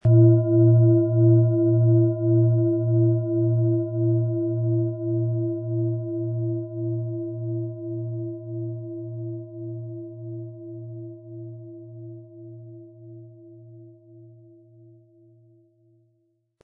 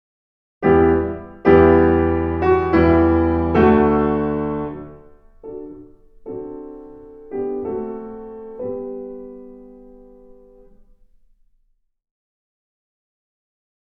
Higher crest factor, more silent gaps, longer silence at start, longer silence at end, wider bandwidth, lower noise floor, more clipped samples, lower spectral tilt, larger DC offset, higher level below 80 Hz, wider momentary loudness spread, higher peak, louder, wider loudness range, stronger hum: about the same, 18 dB vs 20 dB; neither; second, 0.05 s vs 0.6 s; second, 2.4 s vs 4.35 s; second, 1.5 kHz vs 5.4 kHz; first, -69 dBFS vs -63 dBFS; neither; first, -15.5 dB/octave vs -10.5 dB/octave; neither; second, -62 dBFS vs -36 dBFS; about the same, 23 LU vs 22 LU; second, -6 dBFS vs 0 dBFS; second, -22 LUFS vs -17 LUFS; first, 22 LU vs 19 LU; neither